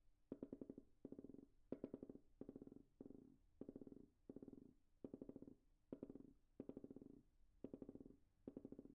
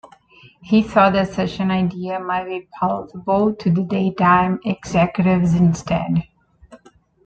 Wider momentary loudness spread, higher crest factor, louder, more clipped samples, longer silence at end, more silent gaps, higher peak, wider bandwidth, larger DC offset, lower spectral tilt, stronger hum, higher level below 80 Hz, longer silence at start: about the same, 8 LU vs 9 LU; first, 26 dB vs 18 dB; second, -61 LUFS vs -19 LUFS; neither; second, 0.05 s vs 0.5 s; neither; second, -34 dBFS vs -2 dBFS; second, 2.8 kHz vs 8 kHz; neither; first, -9.5 dB/octave vs -7.5 dB/octave; neither; second, -78 dBFS vs -48 dBFS; about the same, 0 s vs 0.05 s